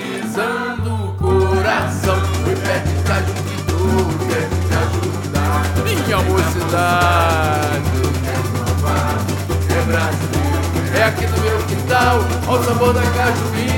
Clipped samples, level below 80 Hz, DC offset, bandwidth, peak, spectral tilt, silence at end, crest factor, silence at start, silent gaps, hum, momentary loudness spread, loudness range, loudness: under 0.1%; -30 dBFS; under 0.1%; 18 kHz; -2 dBFS; -5.5 dB/octave; 0 s; 14 dB; 0 s; none; none; 5 LU; 2 LU; -17 LUFS